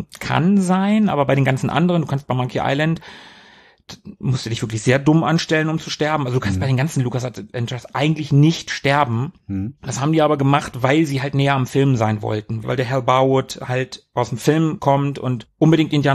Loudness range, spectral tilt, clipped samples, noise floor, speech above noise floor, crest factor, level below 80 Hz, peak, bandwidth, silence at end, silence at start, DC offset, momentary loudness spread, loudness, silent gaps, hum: 3 LU; -6.5 dB/octave; under 0.1%; -49 dBFS; 30 dB; 16 dB; -50 dBFS; -2 dBFS; 14 kHz; 0 s; 0 s; under 0.1%; 10 LU; -19 LUFS; none; none